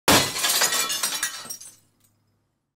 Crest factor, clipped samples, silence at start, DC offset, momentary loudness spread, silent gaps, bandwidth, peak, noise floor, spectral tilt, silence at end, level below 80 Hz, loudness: 20 dB; under 0.1%; 0.05 s; under 0.1%; 17 LU; none; 16 kHz; -6 dBFS; -71 dBFS; -1 dB/octave; 1.05 s; -54 dBFS; -21 LUFS